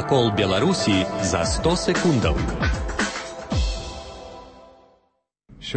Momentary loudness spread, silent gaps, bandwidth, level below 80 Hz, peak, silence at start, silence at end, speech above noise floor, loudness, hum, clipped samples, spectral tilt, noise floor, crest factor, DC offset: 17 LU; none; 8.8 kHz; -32 dBFS; -8 dBFS; 0 s; 0 s; 49 dB; -22 LUFS; none; under 0.1%; -5 dB/octave; -70 dBFS; 16 dB; under 0.1%